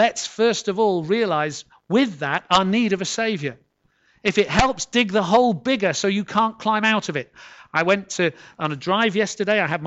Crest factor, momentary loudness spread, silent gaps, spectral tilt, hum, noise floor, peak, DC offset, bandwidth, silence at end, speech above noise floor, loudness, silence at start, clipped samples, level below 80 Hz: 20 dB; 9 LU; none; -4 dB/octave; none; -63 dBFS; -2 dBFS; under 0.1%; 8.2 kHz; 0 s; 43 dB; -21 LUFS; 0 s; under 0.1%; -46 dBFS